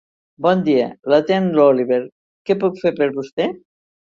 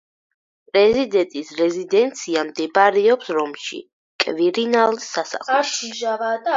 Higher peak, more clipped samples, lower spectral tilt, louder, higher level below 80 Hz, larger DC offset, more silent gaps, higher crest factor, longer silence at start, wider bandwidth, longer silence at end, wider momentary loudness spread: about the same, -2 dBFS vs 0 dBFS; neither; first, -8 dB/octave vs -3 dB/octave; about the same, -18 LUFS vs -19 LUFS; about the same, -62 dBFS vs -62 dBFS; neither; first, 2.12-2.45 s, 3.32-3.37 s vs 3.93-4.19 s; about the same, 16 dB vs 18 dB; second, 0.4 s vs 0.75 s; about the same, 7.2 kHz vs 7.8 kHz; first, 0.55 s vs 0 s; about the same, 9 LU vs 10 LU